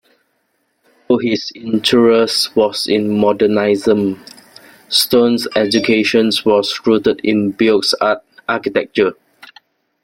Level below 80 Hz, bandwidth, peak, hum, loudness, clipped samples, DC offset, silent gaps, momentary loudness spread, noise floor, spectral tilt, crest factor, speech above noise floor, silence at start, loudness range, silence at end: -56 dBFS; 16.5 kHz; 0 dBFS; none; -14 LUFS; under 0.1%; under 0.1%; none; 7 LU; -65 dBFS; -4.5 dB/octave; 16 dB; 51 dB; 1.1 s; 2 LU; 0.9 s